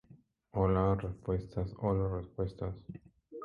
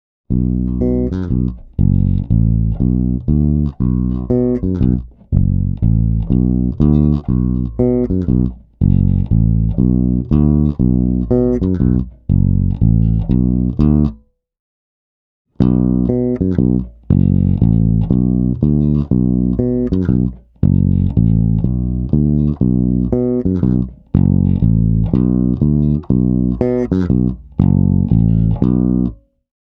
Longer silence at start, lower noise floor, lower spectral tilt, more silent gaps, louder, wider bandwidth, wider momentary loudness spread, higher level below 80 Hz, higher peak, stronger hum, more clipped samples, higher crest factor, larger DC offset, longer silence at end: second, 0.1 s vs 0.3 s; first, -62 dBFS vs -37 dBFS; second, -10.5 dB/octave vs -13 dB/octave; second, none vs 14.59-15.45 s; second, -35 LUFS vs -15 LUFS; first, 5.2 kHz vs 4 kHz; first, 18 LU vs 4 LU; second, -48 dBFS vs -22 dBFS; second, -16 dBFS vs 0 dBFS; neither; neither; about the same, 18 dB vs 14 dB; neither; second, 0 s vs 0.65 s